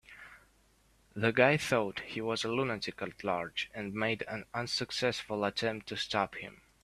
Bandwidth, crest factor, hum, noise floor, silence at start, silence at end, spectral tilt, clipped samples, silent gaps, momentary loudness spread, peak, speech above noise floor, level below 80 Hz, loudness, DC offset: 14.5 kHz; 26 dB; none; -67 dBFS; 0.1 s; 0.3 s; -4.5 dB/octave; under 0.1%; none; 12 LU; -8 dBFS; 34 dB; -66 dBFS; -33 LUFS; under 0.1%